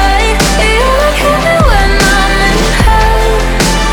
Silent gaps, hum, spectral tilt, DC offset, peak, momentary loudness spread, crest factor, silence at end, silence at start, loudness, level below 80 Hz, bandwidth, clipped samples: none; none; -4 dB/octave; under 0.1%; 0 dBFS; 2 LU; 8 dB; 0 s; 0 s; -9 LUFS; -12 dBFS; 18.5 kHz; 0.3%